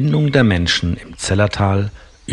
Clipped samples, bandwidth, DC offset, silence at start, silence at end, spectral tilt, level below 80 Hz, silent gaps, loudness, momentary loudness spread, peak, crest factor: under 0.1%; 11 kHz; under 0.1%; 0 s; 0 s; -5.5 dB/octave; -38 dBFS; none; -16 LUFS; 10 LU; 0 dBFS; 16 dB